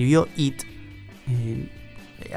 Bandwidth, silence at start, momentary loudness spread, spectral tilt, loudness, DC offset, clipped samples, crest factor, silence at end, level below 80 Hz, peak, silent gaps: 16 kHz; 0 s; 23 LU; -6.5 dB/octave; -25 LUFS; under 0.1%; under 0.1%; 20 dB; 0 s; -48 dBFS; -4 dBFS; none